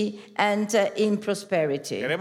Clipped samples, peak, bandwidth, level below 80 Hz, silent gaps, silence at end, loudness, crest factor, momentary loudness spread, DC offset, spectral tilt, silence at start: under 0.1%; -8 dBFS; 15.5 kHz; -80 dBFS; none; 0 s; -25 LUFS; 18 dB; 6 LU; under 0.1%; -4.5 dB/octave; 0 s